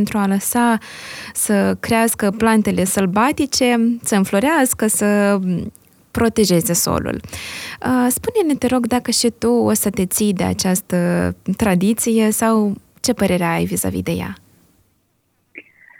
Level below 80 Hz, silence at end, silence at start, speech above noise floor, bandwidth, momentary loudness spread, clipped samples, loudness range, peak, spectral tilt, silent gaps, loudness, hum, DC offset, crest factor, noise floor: -48 dBFS; 0.4 s; 0 s; 47 dB; 19 kHz; 8 LU; under 0.1%; 3 LU; 0 dBFS; -4.5 dB/octave; none; -17 LUFS; none; under 0.1%; 18 dB; -64 dBFS